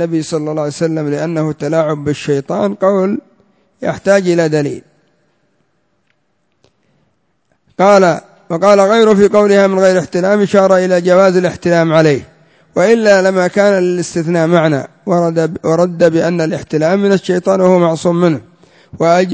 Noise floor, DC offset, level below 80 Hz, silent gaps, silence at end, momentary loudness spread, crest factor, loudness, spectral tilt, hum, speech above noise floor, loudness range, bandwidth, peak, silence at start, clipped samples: -64 dBFS; under 0.1%; -52 dBFS; none; 0 s; 9 LU; 12 dB; -12 LUFS; -6.5 dB/octave; none; 52 dB; 8 LU; 8 kHz; 0 dBFS; 0 s; 0.2%